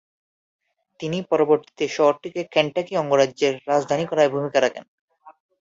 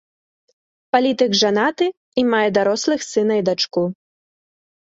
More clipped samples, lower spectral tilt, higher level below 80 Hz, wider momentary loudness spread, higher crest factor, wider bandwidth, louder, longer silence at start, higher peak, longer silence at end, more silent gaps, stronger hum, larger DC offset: neither; about the same, -5 dB/octave vs -4 dB/octave; about the same, -68 dBFS vs -64 dBFS; first, 9 LU vs 5 LU; about the same, 20 dB vs 18 dB; about the same, 7.8 kHz vs 8 kHz; second, -21 LUFS vs -18 LUFS; about the same, 1 s vs 0.95 s; about the same, -2 dBFS vs -2 dBFS; second, 0.3 s vs 1 s; about the same, 4.88-5.08 s vs 1.97-2.12 s; neither; neither